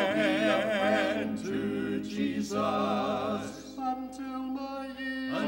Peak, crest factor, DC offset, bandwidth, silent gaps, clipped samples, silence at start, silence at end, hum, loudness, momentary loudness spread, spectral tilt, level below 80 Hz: -14 dBFS; 16 dB; under 0.1%; 16 kHz; none; under 0.1%; 0 s; 0 s; none; -31 LUFS; 10 LU; -5 dB/octave; -62 dBFS